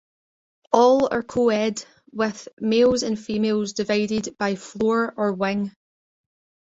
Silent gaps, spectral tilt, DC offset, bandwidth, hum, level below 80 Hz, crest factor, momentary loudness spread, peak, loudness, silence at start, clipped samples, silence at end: 2.53-2.57 s; -5 dB/octave; under 0.1%; 8 kHz; none; -58 dBFS; 20 dB; 9 LU; -2 dBFS; -22 LUFS; 0.7 s; under 0.1%; 0.95 s